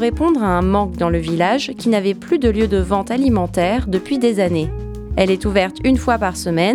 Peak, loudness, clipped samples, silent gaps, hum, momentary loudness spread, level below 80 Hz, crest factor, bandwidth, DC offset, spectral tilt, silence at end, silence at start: 0 dBFS; -17 LUFS; under 0.1%; none; none; 3 LU; -30 dBFS; 16 dB; 14 kHz; under 0.1%; -6 dB/octave; 0 s; 0 s